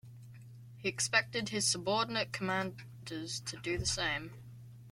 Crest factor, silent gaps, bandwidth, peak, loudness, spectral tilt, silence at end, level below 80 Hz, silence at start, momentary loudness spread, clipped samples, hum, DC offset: 24 dB; none; 16.5 kHz; -14 dBFS; -34 LUFS; -2.5 dB/octave; 0 s; -58 dBFS; 0.05 s; 23 LU; under 0.1%; none; under 0.1%